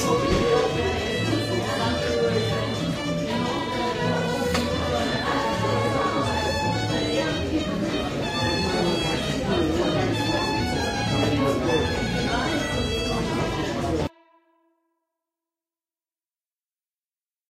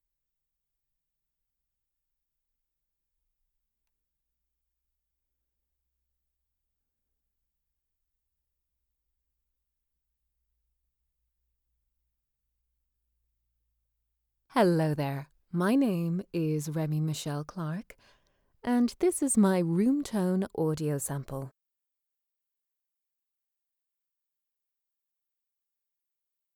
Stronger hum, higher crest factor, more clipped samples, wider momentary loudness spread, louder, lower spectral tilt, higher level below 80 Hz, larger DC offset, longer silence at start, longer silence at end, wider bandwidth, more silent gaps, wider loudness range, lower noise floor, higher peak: neither; second, 16 dB vs 22 dB; neither; second, 4 LU vs 12 LU; first, -24 LUFS vs -29 LUFS; about the same, -5 dB/octave vs -6 dB/octave; first, -40 dBFS vs -68 dBFS; neither; second, 0 s vs 14.55 s; second, 3.4 s vs 5.05 s; second, 16 kHz vs 20 kHz; neither; second, 5 LU vs 9 LU; about the same, under -90 dBFS vs -87 dBFS; first, -8 dBFS vs -14 dBFS